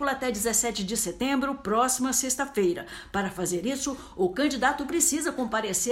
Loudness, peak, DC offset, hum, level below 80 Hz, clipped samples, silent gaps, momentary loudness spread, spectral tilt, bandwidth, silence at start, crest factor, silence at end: -26 LUFS; -10 dBFS; under 0.1%; none; -52 dBFS; under 0.1%; none; 7 LU; -2.5 dB/octave; 16 kHz; 0 s; 18 dB; 0 s